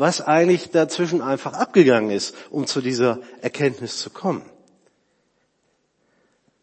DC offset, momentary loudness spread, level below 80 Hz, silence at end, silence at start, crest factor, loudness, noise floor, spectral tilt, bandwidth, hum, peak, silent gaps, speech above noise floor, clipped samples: under 0.1%; 12 LU; -72 dBFS; 2.2 s; 0 s; 20 dB; -21 LUFS; -68 dBFS; -5 dB/octave; 8.8 kHz; none; -2 dBFS; none; 48 dB; under 0.1%